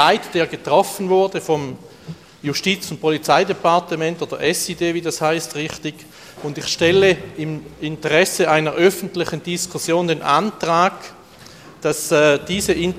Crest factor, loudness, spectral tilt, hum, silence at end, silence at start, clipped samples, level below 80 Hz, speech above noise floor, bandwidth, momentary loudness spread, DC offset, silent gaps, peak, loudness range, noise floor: 18 dB; -18 LUFS; -4 dB/octave; none; 0 s; 0 s; under 0.1%; -52 dBFS; 23 dB; 15.5 kHz; 14 LU; under 0.1%; none; 0 dBFS; 3 LU; -42 dBFS